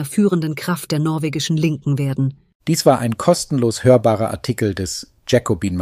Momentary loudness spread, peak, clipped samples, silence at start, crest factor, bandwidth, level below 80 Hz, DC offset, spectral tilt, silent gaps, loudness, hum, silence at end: 9 LU; 0 dBFS; under 0.1%; 0 s; 18 dB; 15.5 kHz; -48 dBFS; under 0.1%; -6 dB/octave; 2.55-2.60 s; -18 LUFS; none; 0 s